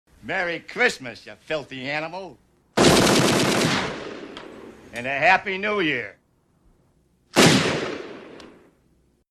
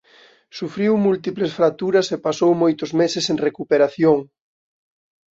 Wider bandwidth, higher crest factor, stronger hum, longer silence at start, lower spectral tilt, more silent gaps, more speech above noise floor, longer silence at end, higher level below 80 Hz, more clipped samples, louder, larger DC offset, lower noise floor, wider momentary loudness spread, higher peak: first, 14.5 kHz vs 7.8 kHz; first, 22 dB vs 16 dB; neither; second, 0.25 s vs 0.55 s; second, -3.5 dB/octave vs -5.5 dB/octave; neither; first, 38 dB vs 33 dB; second, 0.8 s vs 1.15 s; first, -50 dBFS vs -64 dBFS; neither; about the same, -21 LUFS vs -19 LUFS; neither; first, -63 dBFS vs -52 dBFS; first, 21 LU vs 6 LU; about the same, -2 dBFS vs -4 dBFS